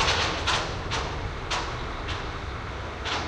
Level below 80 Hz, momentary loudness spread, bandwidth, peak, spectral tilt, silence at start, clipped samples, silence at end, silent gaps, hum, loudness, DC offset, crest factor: -38 dBFS; 10 LU; 11.5 kHz; -10 dBFS; -3 dB/octave; 0 s; under 0.1%; 0 s; none; none; -29 LUFS; under 0.1%; 18 dB